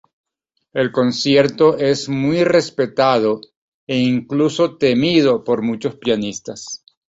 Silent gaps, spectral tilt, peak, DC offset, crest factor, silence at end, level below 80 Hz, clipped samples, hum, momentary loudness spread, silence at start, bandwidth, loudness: 3.57-3.87 s; -5.5 dB/octave; -2 dBFS; under 0.1%; 16 dB; 0.35 s; -56 dBFS; under 0.1%; none; 12 LU; 0.75 s; 8 kHz; -17 LUFS